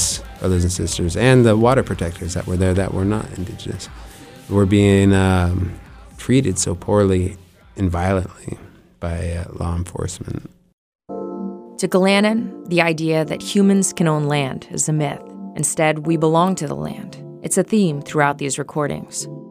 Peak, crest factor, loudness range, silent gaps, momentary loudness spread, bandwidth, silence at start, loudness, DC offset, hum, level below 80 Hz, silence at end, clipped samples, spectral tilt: 0 dBFS; 18 dB; 7 LU; 10.73-10.99 s; 16 LU; 15.5 kHz; 0 s; -19 LUFS; under 0.1%; none; -40 dBFS; 0 s; under 0.1%; -5.5 dB/octave